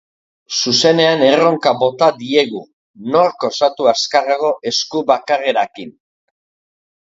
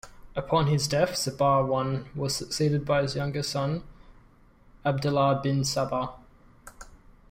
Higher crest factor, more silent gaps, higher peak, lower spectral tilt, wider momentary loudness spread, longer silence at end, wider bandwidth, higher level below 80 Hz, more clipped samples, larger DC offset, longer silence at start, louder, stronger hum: about the same, 16 dB vs 16 dB; first, 2.73-2.94 s vs none; first, 0 dBFS vs -12 dBFS; second, -3.5 dB/octave vs -5 dB/octave; about the same, 10 LU vs 8 LU; first, 1.25 s vs 0.2 s; second, 7.8 kHz vs 16 kHz; second, -64 dBFS vs -52 dBFS; neither; neither; first, 0.5 s vs 0.05 s; first, -15 LUFS vs -27 LUFS; neither